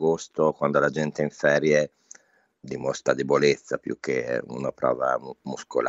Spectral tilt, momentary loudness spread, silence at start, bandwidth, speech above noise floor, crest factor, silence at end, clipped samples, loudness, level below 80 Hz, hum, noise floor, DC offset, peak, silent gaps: -5 dB/octave; 10 LU; 0 s; 8 kHz; 34 dB; 20 dB; 0 s; under 0.1%; -25 LUFS; -64 dBFS; none; -59 dBFS; under 0.1%; -6 dBFS; none